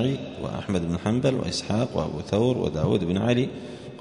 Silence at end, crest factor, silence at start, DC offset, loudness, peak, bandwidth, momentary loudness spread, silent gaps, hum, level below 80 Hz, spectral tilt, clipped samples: 0 s; 16 dB; 0 s; under 0.1%; -25 LUFS; -8 dBFS; 10.5 kHz; 8 LU; none; none; -48 dBFS; -6.5 dB/octave; under 0.1%